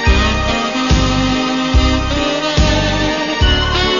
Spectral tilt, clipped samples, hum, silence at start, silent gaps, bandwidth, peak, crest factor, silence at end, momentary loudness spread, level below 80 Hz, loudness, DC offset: -4.5 dB/octave; under 0.1%; none; 0 s; none; 7.4 kHz; -2 dBFS; 12 dB; 0 s; 3 LU; -18 dBFS; -14 LUFS; 0.4%